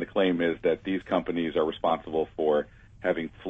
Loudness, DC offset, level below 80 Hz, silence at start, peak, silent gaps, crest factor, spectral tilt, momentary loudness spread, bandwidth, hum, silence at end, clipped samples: -28 LUFS; under 0.1%; -56 dBFS; 0 s; -12 dBFS; none; 14 dB; -7.5 dB/octave; 4 LU; 6.2 kHz; none; 0 s; under 0.1%